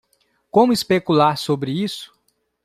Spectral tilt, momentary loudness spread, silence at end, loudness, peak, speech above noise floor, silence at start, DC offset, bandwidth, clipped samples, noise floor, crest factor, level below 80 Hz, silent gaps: -5.5 dB/octave; 9 LU; 0.6 s; -18 LUFS; -2 dBFS; 47 dB; 0.55 s; under 0.1%; 15 kHz; under 0.1%; -65 dBFS; 18 dB; -60 dBFS; none